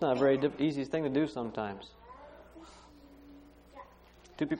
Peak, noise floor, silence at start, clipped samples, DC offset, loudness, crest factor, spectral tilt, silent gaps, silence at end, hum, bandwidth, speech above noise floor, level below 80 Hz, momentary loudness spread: -14 dBFS; -58 dBFS; 0 s; under 0.1%; under 0.1%; -32 LUFS; 20 dB; -7 dB/octave; none; 0 s; none; 9.8 kHz; 27 dB; -62 dBFS; 26 LU